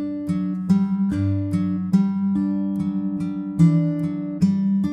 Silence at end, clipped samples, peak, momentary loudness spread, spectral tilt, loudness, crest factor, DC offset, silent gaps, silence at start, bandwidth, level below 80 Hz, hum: 0 s; under 0.1%; -6 dBFS; 7 LU; -9.5 dB/octave; -22 LUFS; 16 dB; under 0.1%; none; 0 s; 8.6 kHz; -52 dBFS; none